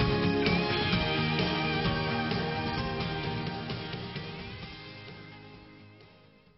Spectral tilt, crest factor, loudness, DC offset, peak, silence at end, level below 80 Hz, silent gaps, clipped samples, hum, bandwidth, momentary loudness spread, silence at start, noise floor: -4 dB/octave; 18 dB; -30 LUFS; under 0.1%; -12 dBFS; 0.5 s; -48 dBFS; none; under 0.1%; none; 6 kHz; 18 LU; 0 s; -58 dBFS